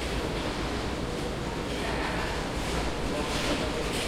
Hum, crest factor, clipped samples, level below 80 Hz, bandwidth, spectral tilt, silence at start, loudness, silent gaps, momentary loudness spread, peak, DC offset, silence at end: none; 14 dB; under 0.1%; -38 dBFS; 16.5 kHz; -4.5 dB/octave; 0 s; -31 LUFS; none; 4 LU; -16 dBFS; under 0.1%; 0 s